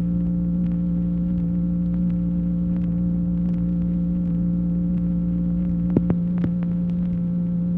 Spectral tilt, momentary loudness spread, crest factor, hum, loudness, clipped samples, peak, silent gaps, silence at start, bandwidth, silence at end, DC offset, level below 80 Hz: -13 dB/octave; 2 LU; 18 dB; none; -23 LUFS; under 0.1%; -4 dBFS; none; 0 s; 2.2 kHz; 0 s; under 0.1%; -34 dBFS